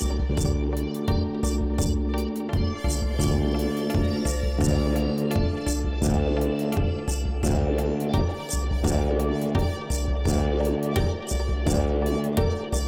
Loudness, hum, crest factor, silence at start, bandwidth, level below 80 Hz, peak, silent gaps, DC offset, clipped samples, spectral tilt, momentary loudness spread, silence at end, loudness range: -25 LUFS; none; 14 dB; 0 s; 17.5 kHz; -28 dBFS; -10 dBFS; none; under 0.1%; under 0.1%; -6 dB/octave; 4 LU; 0 s; 1 LU